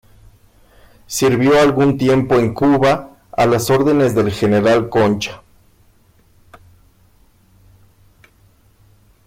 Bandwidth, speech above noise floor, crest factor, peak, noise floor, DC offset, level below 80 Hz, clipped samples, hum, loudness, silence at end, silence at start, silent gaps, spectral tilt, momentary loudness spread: 16.5 kHz; 39 dB; 12 dB; -6 dBFS; -52 dBFS; under 0.1%; -46 dBFS; under 0.1%; none; -15 LUFS; 3.9 s; 1.1 s; none; -6 dB/octave; 8 LU